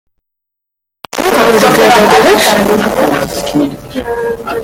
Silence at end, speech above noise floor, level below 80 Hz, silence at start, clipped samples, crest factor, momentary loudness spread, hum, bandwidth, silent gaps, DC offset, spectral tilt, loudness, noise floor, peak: 0 s; 68 dB; -38 dBFS; 1.15 s; under 0.1%; 10 dB; 11 LU; none; 17 kHz; none; under 0.1%; -3.5 dB/octave; -9 LUFS; -77 dBFS; 0 dBFS